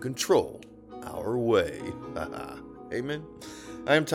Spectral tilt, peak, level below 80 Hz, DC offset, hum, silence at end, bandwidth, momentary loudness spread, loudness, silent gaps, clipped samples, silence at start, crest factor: -4.5 dB/octave; -8 dBFS; -56 dBFS; under 0.1%; none; 0 s; 18 kHz; 18 LU; -29 LUFS; none; under 0.1%; 0 s; 22 dB